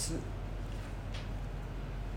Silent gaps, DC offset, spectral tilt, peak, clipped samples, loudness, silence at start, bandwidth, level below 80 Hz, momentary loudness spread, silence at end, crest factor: none; under 0.1%; -4.5 dB/octave; -24 dBFS; under 0.1%; -42 LUFS; 0 s; 16 kHz; -42 dBFS; 3 LU; 0 s; 14 dB